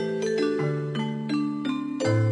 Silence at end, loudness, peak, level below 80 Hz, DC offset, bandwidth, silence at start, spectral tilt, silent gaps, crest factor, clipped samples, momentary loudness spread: 0 s; -27 LUFS; -12 dBFS; -66 dBFS; under 0.1%; 10.5 kHz; 0 s; -7 dB/octave; none; 14 dB; under 0.1%; 4 LU